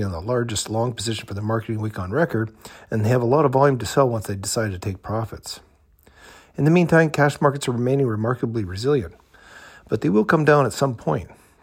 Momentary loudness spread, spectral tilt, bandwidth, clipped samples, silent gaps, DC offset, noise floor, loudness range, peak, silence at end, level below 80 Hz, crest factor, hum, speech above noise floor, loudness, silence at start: 12 LU; -6 dB/octave; 16 kHz; under 0.1%; none; under 0.1%; -55 dBFS; 3 LU; -4 dBFS; 0.3 s; -50 dBFS; 18 dB; none; 34 dB; -21 LUFS; 0 s